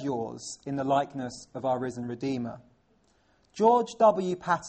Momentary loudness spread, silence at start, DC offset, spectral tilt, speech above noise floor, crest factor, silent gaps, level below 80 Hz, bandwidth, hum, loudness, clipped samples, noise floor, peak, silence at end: 15 LU; 0 s; under 0.1%; -5.5 dB/octave; 39 dB; 18 dB; none; -66 dBFS; 8.4 kHz; none; -28 LUFS; under 0.1%; -67 dBFS; -10 dBFS; 0 s